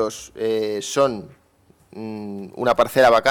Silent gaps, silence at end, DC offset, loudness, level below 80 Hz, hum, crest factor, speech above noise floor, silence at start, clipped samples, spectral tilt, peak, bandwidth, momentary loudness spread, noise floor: none; 0 s; under 0.1%; -20 LUFS; -56 dBFS; none; 16 dB; 37 dB; 0 s; under 0.1%; -4 dB/octave; -6 dBFS; 18 kHz; 18 LU; -57 dBFS